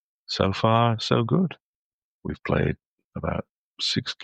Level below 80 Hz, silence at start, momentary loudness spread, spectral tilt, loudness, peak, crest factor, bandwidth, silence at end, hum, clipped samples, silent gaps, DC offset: -48 dBFS; 0.3 s; 16 LU; -6 dB/octave; -25 LUFS; -4 dBFS; 20 dB; 9 kHz; 0 s; none; under 0.1%; 1.60-2.21 s, 2.86-2.98 s, 3.04-3.11 s, 3.49-3.75 s; under 0.1%